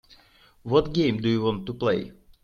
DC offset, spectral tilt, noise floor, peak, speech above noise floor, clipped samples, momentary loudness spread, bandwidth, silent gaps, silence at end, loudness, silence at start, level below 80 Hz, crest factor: under 0.1%; -7.5 dB/octave; -57 dBFS; -6 dBFS; 33 dB; under 0.1%; 11 LU; 7 kHz; none; 0.3 s; -25 LUFS; 0.65 s; -50 dBFS; 20 dB